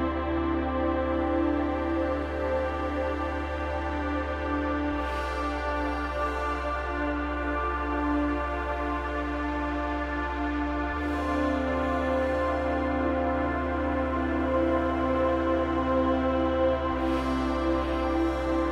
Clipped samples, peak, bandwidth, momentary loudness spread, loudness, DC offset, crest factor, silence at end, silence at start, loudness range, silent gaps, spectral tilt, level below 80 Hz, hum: under 0.1%; -14 dBFS; 10.5 kHz; 5 LU; -28 LUFS; under 0.1%; 14 dB; 0 s; 0 s; 4 LU; none; -7.5 dB/octave; -36 dBFS; none